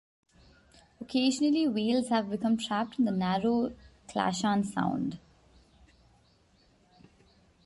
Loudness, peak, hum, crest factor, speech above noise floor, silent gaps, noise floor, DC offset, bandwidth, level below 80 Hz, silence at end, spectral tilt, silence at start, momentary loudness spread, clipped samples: -29 LUFS; -12 dBFS; none; 18 dB; 36 dB; none; -65 dBFS; under 0.1%; 11.5 kHz; -64 dBFS; 2.5 s; -5.5 dB/octave; 1 s; 10 LU; under 0.1%